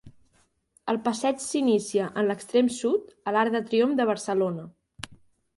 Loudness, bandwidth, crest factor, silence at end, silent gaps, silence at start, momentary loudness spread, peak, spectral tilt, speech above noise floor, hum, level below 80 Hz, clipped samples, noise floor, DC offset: -26 LUFS; 11.5 kHz; 16 dB; 0.45 s; none; 0.05 s; 15 LU; -10 dBFS; -4.5 dB/octave; 42 dB; none; -66 dBFS; under 0.1%; -67 dBFS; under 0.1%